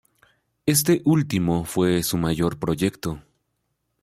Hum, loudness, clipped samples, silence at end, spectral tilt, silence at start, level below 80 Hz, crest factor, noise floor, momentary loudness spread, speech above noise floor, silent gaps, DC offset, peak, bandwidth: none; -22 LUFS; under 0.1%; 0.85 s; -5 dB/octave; 0.65 s; -50 dBFS; 18 dB; -75 dBFS; 10 LU; 53 dB; none; under 0.1%; -6 dBFS; 16 kHz